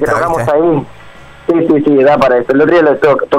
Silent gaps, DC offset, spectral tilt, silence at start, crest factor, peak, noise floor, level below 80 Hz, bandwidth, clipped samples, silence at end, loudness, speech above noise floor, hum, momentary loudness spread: none; under 0.1%; -7 dB/octave; 0 s; 8 dB; -2 dBFS; -34 dBFS; -40 dBFS; 14 kHz; under 0.1%; 0 s; -10 LUFS; 25 dB; none; 6 LU